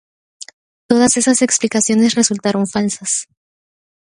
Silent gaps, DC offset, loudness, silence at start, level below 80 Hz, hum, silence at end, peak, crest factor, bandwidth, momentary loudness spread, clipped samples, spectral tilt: none; under 0.1%; -15 LUFS; 0.9 s; -58 dBFS; none; 0.9 s; 0 dBFS; 16 dB; 11.5 kHz; 23 LU; under 0.1%; -3 dB/octave